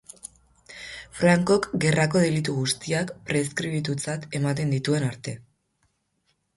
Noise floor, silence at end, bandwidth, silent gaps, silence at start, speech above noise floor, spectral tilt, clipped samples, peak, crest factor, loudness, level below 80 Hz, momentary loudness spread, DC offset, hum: -72 dBFS; 1.15 s; 11.5 kHz; none; 0.25 s; 48 dB; -5.5 dB/octave; under 0.1%; -6 dBFS; 20 dB; -24 LUFS; -58 dBFS; 19 LU; under 0.1%; none